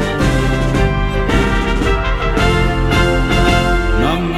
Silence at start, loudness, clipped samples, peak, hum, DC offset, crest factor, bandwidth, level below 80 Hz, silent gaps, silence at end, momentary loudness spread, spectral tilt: 0 s; -15 LUFS; under 0.1%; 0 dBFS; none; 0.4%; 12 dB; 13.5 kHz; -18 dBFS; none; 0 s; 3 LU; -6 dB/octave